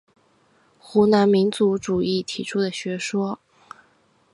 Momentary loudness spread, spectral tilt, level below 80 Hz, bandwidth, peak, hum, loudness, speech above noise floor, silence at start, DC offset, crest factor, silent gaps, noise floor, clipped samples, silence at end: 10 LU; -5.5 dB/octave; -60 dBFS; 11.5 kHz; -4 dBFS; none; -21 LUFS; 40 dB; 0.85 s; under 0.1%; 18 dB; none; -61 dBFS; under 0.1%; 1 s